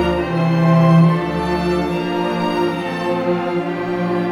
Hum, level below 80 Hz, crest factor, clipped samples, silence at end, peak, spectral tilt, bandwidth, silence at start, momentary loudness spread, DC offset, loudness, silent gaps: none; -40 dBFS; 14 dB; under 0.1%; 0 s; -2 dBFS; -8 dB/octave; 10.5 kHz; 0 s; 9 LU; under 0.1%; -17 LUFS; none